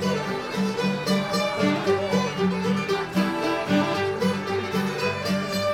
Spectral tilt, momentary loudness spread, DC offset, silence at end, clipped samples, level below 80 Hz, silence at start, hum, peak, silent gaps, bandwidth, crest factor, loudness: -5.5 dB/octave; 3 LU; under 0.1%; 0 s; under 0.1%; -56 dBFS; 0 s; none; -10 dBFS; none; 16 kHz; 14 dB; -24 LUFS